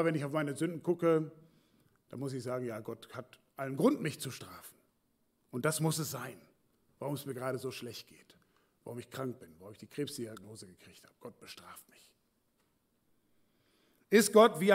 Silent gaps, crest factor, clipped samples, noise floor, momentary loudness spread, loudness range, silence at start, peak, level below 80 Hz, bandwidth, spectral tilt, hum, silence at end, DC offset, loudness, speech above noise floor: none; 24 dB; under 0.1%; -76 dBFS; 23 LU; 11 LU; 0 s; -12 dBFS; -82 dBFS; 16 kHz; -5 dB/octave; none; 0 s; under 0.1%; -33 LUFS; 43 dB